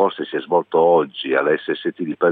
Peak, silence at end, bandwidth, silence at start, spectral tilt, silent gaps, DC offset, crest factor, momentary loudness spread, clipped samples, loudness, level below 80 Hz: -2 dBFS; 0 s; 4.5 kHz; 0 s; -9 dB/octave; none; under 0.1%; 16 dB; 9 LU; under 0.1%; -19 LUFS; -74 dBFS